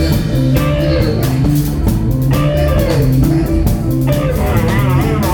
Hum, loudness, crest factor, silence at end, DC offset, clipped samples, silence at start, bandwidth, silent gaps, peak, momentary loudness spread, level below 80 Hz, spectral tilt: none; -14 LUFS; 12 dB; 0 s; under 0.1%; under 0.1%; 0 s; 19.5 kHz; none; 0 dBFS; 2 LU; -20 dBFS; -7 dB/octave